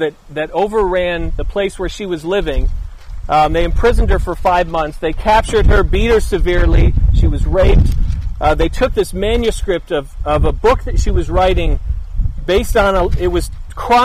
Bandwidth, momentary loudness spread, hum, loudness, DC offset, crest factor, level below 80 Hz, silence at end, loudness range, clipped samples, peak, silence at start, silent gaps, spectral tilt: 14 kHz; 9 LU; none; -16 LUFS; under 0.1%; 10 dB; -16 dBFS; 0 s; 3 LU; under 0.1%; -2 dBFS; 0 s; none; -6 dB/octave